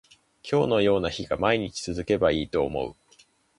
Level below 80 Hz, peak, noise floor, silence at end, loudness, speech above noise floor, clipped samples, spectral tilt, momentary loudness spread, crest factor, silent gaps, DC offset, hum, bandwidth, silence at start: -48 dBFS; -8 dBFS; -60 dBFS; 0.65 s; -25 LUFS; 35 dB; under 0.1%; -5.5 dB/octave; 10 LU; 18 dB; none; under 0.1%; none; 11.5 kHz; 0.45 s